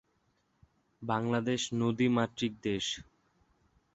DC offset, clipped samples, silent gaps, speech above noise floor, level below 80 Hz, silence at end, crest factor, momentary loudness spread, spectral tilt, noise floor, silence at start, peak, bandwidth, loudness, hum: under 0.1%; under 0.1%; none; 43 dB; -66 dBFS; 0.9 s; 20 dB; 7 LU; -5 dB/octave; -75 dBFS; 1 s; -14 dBFS; 8.2 kHz; -32 LUFS; none